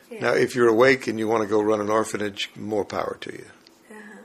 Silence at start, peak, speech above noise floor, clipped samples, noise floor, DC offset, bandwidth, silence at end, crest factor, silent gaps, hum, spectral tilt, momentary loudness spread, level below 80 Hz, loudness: 0.1 s; -4 dBFS; 24 dB; under 0.1%; -46 dBFS; under 0.1%; 13.5 kHz; 0 s; 20 dB; none; none; -5 dB/octave; 16 LU; -62 dBFS; -22 LUFS